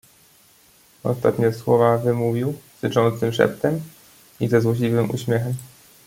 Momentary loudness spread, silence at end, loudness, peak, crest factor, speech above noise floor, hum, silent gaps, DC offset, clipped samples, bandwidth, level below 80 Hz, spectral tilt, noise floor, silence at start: 10 LU; 0.4 s; -21 LUFS; -2 dBFS; 20 dB; 34 dB; none; none; under 0.1%; under 0.1%; 16.5 kHz; -58 dBFS; -7 dB/octave; -54 dBFS; 1.05 s